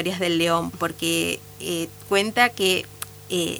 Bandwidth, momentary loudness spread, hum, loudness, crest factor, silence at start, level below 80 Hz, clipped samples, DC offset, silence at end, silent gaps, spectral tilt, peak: over 20 kHz; 10 LU; none; -23 LUFS; 22 dB; 0 s; -56 dBFS; under 0.1%; under 0.1%; 0 s; none; -3.5 dB/octave; -2 dBFS